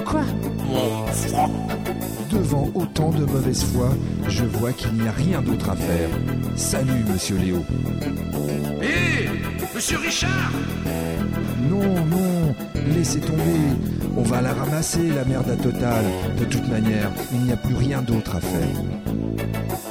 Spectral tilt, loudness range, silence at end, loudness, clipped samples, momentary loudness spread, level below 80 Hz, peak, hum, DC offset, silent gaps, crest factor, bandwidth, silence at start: -5.5 dB/octave; 1 LU; 0 s; -22 LUFS; under 0.1%; 5 LU; -36 dBFS; -8 dBFS; none; 0.2%; none; 14 dB; 17 kHz; 0 s